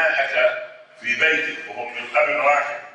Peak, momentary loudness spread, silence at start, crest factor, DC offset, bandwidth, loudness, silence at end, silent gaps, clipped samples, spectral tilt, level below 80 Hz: -6 dBFS; 13 LU; 0 s; 16 dB; under 0.1%; 9.4 kHz; -20 LUFS; 0 s; none; under 0.1%; -2 dB/octave; -72 dBFS